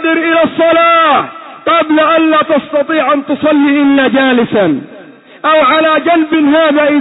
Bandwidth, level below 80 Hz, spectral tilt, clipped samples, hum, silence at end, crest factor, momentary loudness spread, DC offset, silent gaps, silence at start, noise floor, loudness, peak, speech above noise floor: 4.1 kHz; -54 dBFS; -8.5 dB/octave; under 0.1%; none; 0 s; 8 dB; 5 LU; under 0.1%; none; 0 s; -35 dBFS; -9 LUFS; 0 dBFS; 26 dB